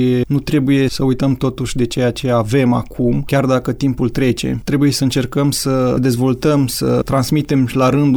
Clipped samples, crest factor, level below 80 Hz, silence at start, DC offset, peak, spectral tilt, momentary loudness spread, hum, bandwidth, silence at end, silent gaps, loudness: under 0.1%; 12 dB; -36 dBFS; 0 s; under 0.1%; -4 dBFS; -6 dB/octave; 4 LU; none; 20 kHz; 0 s; none; -16 LUFS